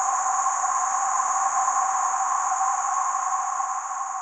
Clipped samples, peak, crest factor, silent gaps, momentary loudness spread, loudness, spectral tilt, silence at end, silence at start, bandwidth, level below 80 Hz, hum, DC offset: under 0.1%; -10 dBFS; 14 dB; none; 4 LU; -24 LUFS; 2 dB/octave; 0 s; 0 s; 9.6 kHz; -86 dBFS; none; under 0.1%